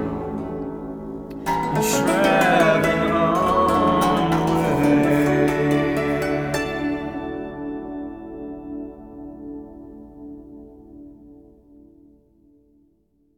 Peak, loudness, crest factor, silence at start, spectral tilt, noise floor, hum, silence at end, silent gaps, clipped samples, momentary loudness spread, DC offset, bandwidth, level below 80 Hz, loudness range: -4 dBFS; -20 LUFS; 18 dB; 0 s; -5.5 dB/octave; -63 dBFS; none; 2 s; none; under 0.1%; 21 LU; under 0.1%; over 20 kHz; -44 dBFS; 20 LU